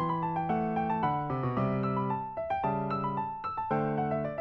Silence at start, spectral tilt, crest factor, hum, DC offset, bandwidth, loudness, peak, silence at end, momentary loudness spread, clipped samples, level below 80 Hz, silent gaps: 0 s; -10 dB/octave; 14 dB; none; under 0.1%; 5.8 kHz; -31 LUFS; -16 dBFS; 0 s; 4 LU; under 0.1%; -58 dBFS; none